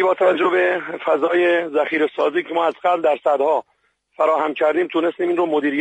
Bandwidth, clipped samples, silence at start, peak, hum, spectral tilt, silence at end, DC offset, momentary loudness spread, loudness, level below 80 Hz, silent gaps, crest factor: 8.6 kHz; under 0.1%; 0 s; -4 dBFS; none; -5.5 dB/octave; 0 s; under 0.1%; 4 LU; -19 LUFS; -72 dBFS; none; 14 dB